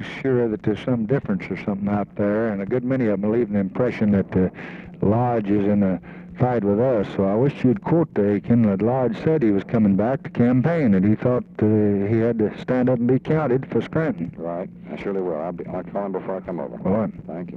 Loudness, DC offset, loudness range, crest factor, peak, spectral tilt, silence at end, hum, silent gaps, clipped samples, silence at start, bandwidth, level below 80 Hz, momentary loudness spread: -22 LUFS; under 0.1%; 5 LU; 14 dB; -8 dBFS; -10 dB/octave; 0 s; none; none; under 0.1%; 0 s; 6 kHz; -52 dBFS; 10 LU